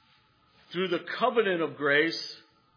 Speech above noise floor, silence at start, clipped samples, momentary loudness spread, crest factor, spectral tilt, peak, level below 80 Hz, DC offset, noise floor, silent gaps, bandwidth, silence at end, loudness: 37 dB; 0.7 s; under 0.1%; 14 LU; 18 dB; -5 dB/octave; -12 dBFS; -84 dBFS; under 0.1%; -64 dBFS; none; 5.4 kHz; 0.4 s; -27 LUFS